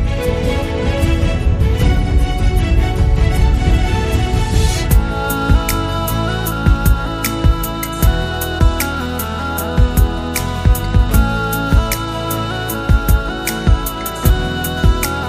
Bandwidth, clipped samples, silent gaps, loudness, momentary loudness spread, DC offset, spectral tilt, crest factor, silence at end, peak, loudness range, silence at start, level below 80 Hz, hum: 15.5 kHz; under 0.1%; none; -16 LUFS; 5 LU; under 0.1%; -5.5 dB/octave; 14 dB; 0 s; 0 dBFS; 2 LU; 0 s; -16 dBFS; none